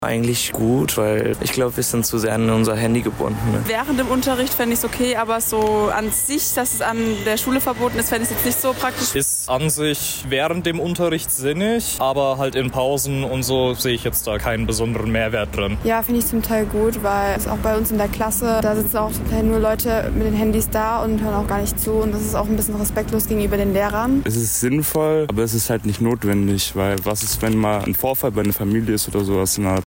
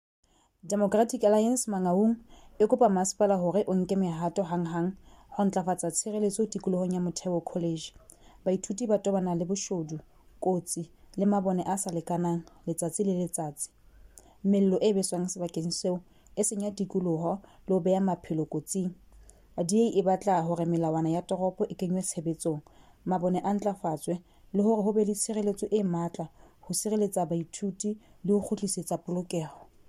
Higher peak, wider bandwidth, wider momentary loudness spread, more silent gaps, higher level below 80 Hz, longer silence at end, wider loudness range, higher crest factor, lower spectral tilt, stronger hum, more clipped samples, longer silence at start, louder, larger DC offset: about the same, -8 dBFS vs -10 dBFS; about the same, 16.5 kHz vs 15 kHz; second, 3 LU vs 10 LU; neither; first, -34 dBFS vs -62 dBFS; second, 0.05 s vs 0.25 s; second, 1 LU vs 4 LU; second, 10 dB vs 18 dB; second, -4.5 dB/octave vs -6 dB/octave; neither; neither; second, 0 s vs 0.65 s; first, -19 LUFS vs -29 LUFS; neither